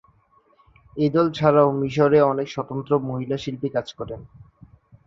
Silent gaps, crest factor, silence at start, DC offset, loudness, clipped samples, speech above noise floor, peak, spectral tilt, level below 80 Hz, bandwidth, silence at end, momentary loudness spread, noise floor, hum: none; 20 dB; 0.95 s; under 0.1%; -21 LUFS; under 0.1%; 39 dB; -2 dBFS; -7.5 dB/octave; -56 dBFS; 7.4 kHz; 0.85 s; 17 LU; -60 dBFS; none